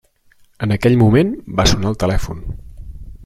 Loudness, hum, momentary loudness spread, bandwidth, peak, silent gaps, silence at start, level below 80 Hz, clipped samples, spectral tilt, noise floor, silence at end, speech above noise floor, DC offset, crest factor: -16 LUFS; none; 21 LU; 14 kHz; -2 dBFS; none; 0.6 s; -28 dBFS; under 0.1%; -6 dB/octave; -52 dBFS; 0 s; 37 dB; under 0.1%; 16 dB